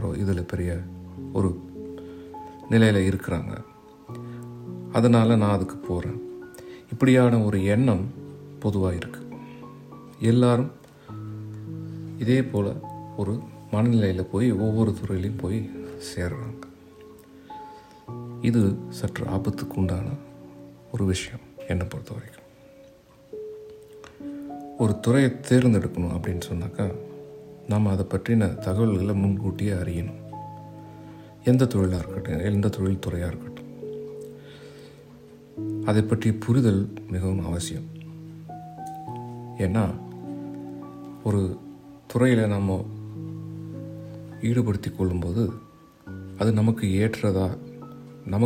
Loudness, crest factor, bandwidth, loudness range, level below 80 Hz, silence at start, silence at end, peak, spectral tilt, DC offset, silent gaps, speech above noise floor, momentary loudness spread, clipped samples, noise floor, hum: -25 LUFS; 20 dB; 15.5 kHz; 7 LU; -54 dBFS; 0 s; 0 s; -6 dBFS; -7.5 dB/octave; under 0.1%; none; 29 dB; 21 LU; under 0.1%; -52 dBFS; none